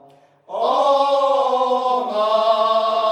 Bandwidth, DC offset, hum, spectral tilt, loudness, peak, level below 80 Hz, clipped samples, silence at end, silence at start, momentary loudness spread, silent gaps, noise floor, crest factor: 11 kHz; under 0.1%; none; -3 dB/octave; -18 LUFS; -4 dBFS; -80 dBFS; under 0.1%; 0 s; 0.5 s; 4 LU; none; -49 dBFS; 14 dB